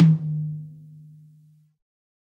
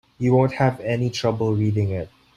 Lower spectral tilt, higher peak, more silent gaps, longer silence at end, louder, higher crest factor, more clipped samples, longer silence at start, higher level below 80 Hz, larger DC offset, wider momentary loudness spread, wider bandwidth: first, -10.5 dB/octave vs -7.5 dB/octave; about the same, -6 dBFS vs -4 dBFS; neither; first, 1.6 s vs 0.3 s; about the same, -24 LUFS vs -22 LUFS; about the same, 18 dB vs 16 dB; neither; second, 0 s vs 0.2 s; second, -70 dBFS vs -52 dBFS; neither; first, 26 LU vs 6 LU; second, 3.5 kHz vs 11 kHz